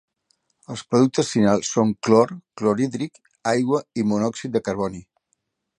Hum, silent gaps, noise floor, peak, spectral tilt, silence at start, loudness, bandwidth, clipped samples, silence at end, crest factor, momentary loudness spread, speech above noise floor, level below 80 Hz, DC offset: none; none; -73 dBFS; -2 dBFS; -5.5 dB/octave; 0.7 s; -22 LUFS; 10.5 kHz; under 0.1%; 0.75 s; 20 dB; 12 LU; 52 dB; -58 dBFS; under 0.1%